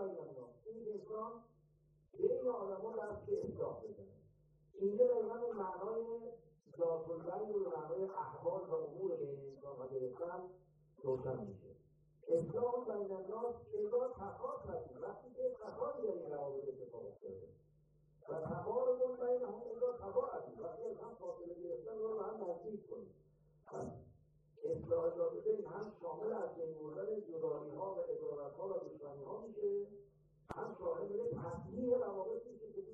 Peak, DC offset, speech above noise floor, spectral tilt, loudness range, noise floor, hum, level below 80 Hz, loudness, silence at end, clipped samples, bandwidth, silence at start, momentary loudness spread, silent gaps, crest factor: -22 dBFS; under 0.1%; 30 dB; -9.5 dB/octave; 5 LU; -72 dBFS; none; -74 dBFS; -43 LUFS; 0 s; under 0.1%; 7.4 kHz; 0 s; 13 LU; none; 20 dB